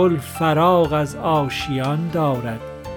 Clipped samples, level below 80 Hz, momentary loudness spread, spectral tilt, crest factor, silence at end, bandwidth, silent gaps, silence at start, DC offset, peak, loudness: under 0.1%; -44 dBFS; 8 LU; -6.5 dB/octave; 14 dB; 0 s; 19.5 kHz; none; 0 s; under 0.1%; -4 dBFS; -20 LUFS